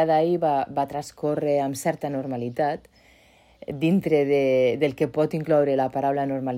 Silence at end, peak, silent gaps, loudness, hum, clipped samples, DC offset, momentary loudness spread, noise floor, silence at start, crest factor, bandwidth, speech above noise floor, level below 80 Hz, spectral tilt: 0 s; -8 dBFS; none; -24 LUFS; none; under 0.1%; under 0.1%; 8 LU; -56 dBFS; 0 s; 14 dB; 16 kHz; 33 dB; -60 dBFS; -6.5 dB/octave